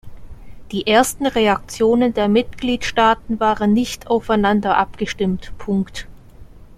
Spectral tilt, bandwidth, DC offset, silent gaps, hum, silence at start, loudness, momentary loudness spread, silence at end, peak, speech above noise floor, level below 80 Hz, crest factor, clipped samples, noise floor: -5 dB/octave; 14.5 kHz; under 0.1%; none; none; 0.05 s; -18 LUFS; 7 LU; 0.05 s; -2 dBFS; 22 dB; -40 dBFS; 16 dB; under 0.1%; -40 dBFS